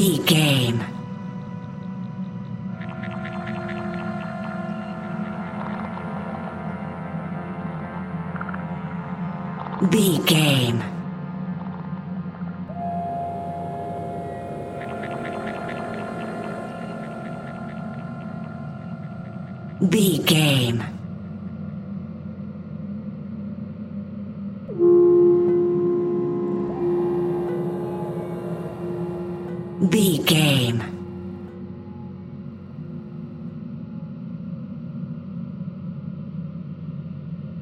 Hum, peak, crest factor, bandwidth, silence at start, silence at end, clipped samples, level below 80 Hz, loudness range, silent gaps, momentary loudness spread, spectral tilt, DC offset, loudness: none; -4 dBFS; 22 dB; 16 kHz; 0 s; 0 s; under 0.1%; -58 dBFS; 13 LU; none; 17 LU; -5.5 dB/octave; under 0.1%; -25 LUFS